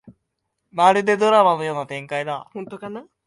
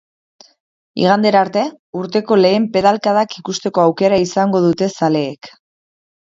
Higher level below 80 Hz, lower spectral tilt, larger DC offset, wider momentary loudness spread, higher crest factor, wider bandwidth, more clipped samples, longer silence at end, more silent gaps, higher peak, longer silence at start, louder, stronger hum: second, -70 dBFS vs -56 dBFS; about the same, -5 dB/octave vs -5.5 dB/octave; neither; first, 18 LU vs 10 LU; about the same, 20 dB vs 16 dB; first, 11.5 kHz vs 7.8 kHz; neither; second, 0.25 s vs 0.9 s; second, none vs 1.79-1.93 s; about the same, -2 dBFS vs 0 dBFS; second, 0.05 s vs 0.95 s; second, -19 LUFS vs -15 LUFS; neither